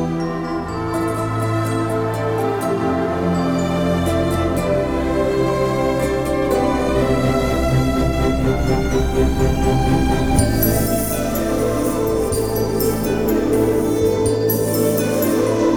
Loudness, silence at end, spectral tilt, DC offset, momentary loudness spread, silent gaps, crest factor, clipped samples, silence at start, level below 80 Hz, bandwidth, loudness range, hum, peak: -18 LUFS; 0 s; -6 dB/octave; under 0.1%; 3 LU; none; 14 dB; under 0.1%; 0 s; -28 dBFS; over 20 kHz; 2 LU; none; -2 dBFS